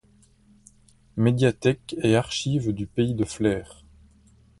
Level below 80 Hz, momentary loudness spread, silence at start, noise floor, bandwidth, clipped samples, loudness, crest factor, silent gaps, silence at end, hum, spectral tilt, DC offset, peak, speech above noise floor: -50 dBFS; 6 LU; 1.15 s; -58 dBFS; 11.5 kHz; under 0.1%; -24 LUFS; 20 dB; none; 0.85 s; none; -6 dB/octave; under 0.1%; -6 dBFS; 35 dB